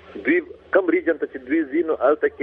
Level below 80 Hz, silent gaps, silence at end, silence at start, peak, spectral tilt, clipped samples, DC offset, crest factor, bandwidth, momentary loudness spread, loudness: -60 dBFS; none; 0 s; 0.1 s; -2 dBFS; -8.5 dB/octave; under 0.1%; under 0.1%; 18 dB; 3.8 kHz; 5 LU; -21 LUFS